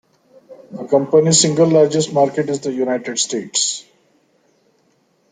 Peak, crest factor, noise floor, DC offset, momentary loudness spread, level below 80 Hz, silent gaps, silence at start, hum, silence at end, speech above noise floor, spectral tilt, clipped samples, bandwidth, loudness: -2 dBFS; 16 dB; -60 dBFS; under 0.1%; 9 LU; -60 dBFS; none; 0.5 s; none; 1.5 s; 45 dB; -4 dB/octave; under 0.1%; 9.6 kHz; -16 LUFS